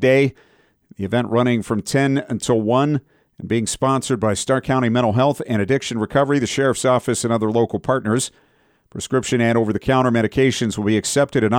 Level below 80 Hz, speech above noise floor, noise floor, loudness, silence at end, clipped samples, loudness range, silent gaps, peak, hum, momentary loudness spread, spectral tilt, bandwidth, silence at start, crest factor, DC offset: -50 dBFS; 33 dB; -51 dBFS; -19 LUFS; 0 s; under 0.1%; 2 LU; none; -4 dBFS; none; 5 LU; -5.5 dB/octave; 16.5 kHz; 0 s; 14 dB; under 0.1%